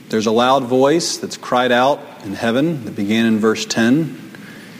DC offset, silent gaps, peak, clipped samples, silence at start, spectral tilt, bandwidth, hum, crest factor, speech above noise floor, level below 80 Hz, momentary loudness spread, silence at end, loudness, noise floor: under 0.1%; none; -2 dBFS; under 0.1%; 0 s; -4.5 dB/octave; 16 kHz; none; 16 dB; 20 dB; -60 dBFS; 12 LU; 0 s; -17 LUFS; -36 dBFS